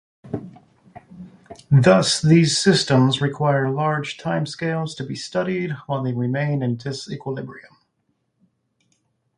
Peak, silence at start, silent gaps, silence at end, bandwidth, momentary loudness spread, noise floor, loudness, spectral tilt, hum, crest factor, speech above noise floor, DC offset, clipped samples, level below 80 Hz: -2 dBFS; 0.25 s; none; 1.75 s; 11 kHz; 17 LU; -71 dBFS; -20 LUFS; -5.5 dB/octave; none; 18 dB; 51 dB; under 0.1%; under 0.1%; -58 dBFS